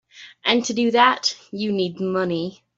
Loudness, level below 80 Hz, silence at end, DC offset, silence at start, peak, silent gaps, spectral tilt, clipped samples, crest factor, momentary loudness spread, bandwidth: -21 LUFS; -66 dBFS; 0.25 s; under 0.1%; 0.15 s; -4 dBFS; none; -4 dB/octave; under 0.1%; 18 dB; 9 LU; 8 kHz